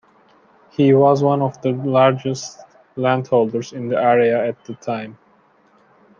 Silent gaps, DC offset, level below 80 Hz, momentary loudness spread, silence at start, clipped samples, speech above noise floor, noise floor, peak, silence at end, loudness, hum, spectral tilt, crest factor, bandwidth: none; under 0.1%; -66 dBFS; 15 LU; 0.8 s; under 0.1%; 38 dB; -55 dBFS; -2 dBFS; 1.05 s; -18 LUFS; none; -7 dB/octave; 16 dB; 7.4 kHz